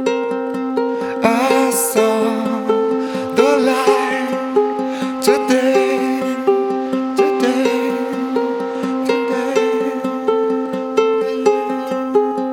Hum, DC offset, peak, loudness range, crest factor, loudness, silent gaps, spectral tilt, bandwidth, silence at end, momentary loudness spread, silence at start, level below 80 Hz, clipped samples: none; under 0.1%; 0 dBFS; 2 LU; 16 dB; -17 LUFS; none; -4 dB/octave; 18.5 kHz; 0 s; 6 LU; 0 s; -62 dBFS; under 0.1%